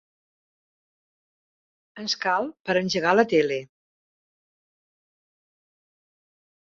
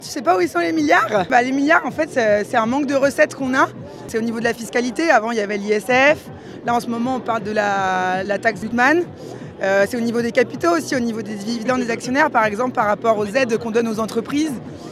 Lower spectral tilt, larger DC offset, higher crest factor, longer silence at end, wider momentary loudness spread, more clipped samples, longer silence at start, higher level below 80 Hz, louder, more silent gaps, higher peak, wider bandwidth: about the same, -4.5 dB/octave vs -4.5 dB/octave; neither; first, 24 dB vs 18 dB; first, 3.1 s vs 0 s; about the same, 10 LU vs 8 LU; neither; first, 1.95 s vs 0 s; second, -70 dBFS vs -58 dBFS; second, -23 LUFS vs -19 LUFS; first, 2.60-2.64 s vs none; second, -4 dBFS vs 0 dBFS; second, 7.6 kHz vs 14.5 kHz